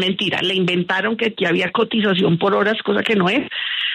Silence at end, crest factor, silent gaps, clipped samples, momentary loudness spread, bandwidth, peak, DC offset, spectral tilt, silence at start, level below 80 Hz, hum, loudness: 0 s; 14 dB; none; under 0.1%; 3 LU; 10 kHz; -4 dBFS; under 0.1%; -6 dB/octave; 0 s; -60 dBFS; none; -18 LUFS